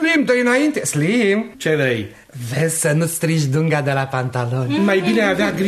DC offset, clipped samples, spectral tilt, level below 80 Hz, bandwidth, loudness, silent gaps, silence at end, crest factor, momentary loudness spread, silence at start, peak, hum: under 0.1%; under 0.1%; -5 dB/octave; -54 dBFS; 13.5 kHz; -18 LUFS; none; 0 s; 14 dB; 6 LU; 0 s; -4 dBFS; none